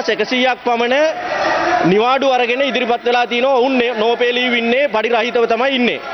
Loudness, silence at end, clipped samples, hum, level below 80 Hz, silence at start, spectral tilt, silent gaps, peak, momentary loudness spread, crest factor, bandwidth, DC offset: -15 LUFS; 0 s; under 0.1%; none; -54 dBFS; 0 s; -4.5 dB/octave; none; -4 dBFS; 3 LU; 12 dB; 6.4 kHz; under 0.1%